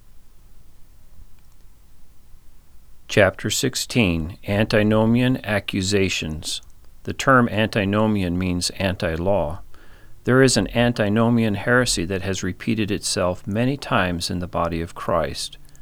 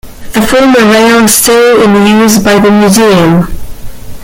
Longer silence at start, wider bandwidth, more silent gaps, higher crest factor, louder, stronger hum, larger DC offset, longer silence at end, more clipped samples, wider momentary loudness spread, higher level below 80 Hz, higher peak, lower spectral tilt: about the same, 0.05 s vs 0.05 s; second, 17.5 kHz vs over 20 kHz; neither; first, 20 dB vs 6 dB; second, -21 LUFS vs -5 LUFS; neither; neither; about the same, 0 s vs 0 s; second, under 0.1% vs 0.6%; first, 10 LU vs 7 LU; second, -42 dBFS vs -28 dBFS; about the same, -2 dBFS vs 0 dBFS; about the same, -5 dB/octave vs -4.5 dB/octave